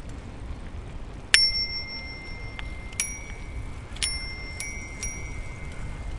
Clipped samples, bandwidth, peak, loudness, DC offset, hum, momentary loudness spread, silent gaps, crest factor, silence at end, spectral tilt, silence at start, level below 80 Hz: under 0.1%; 11.5 kHz; 0 dBFS; -28 LUFS; under 0.1%; none; 19 LU; none; 30 dB; 0 s; -1.5 dB/octave; 0 s; -38 dBFS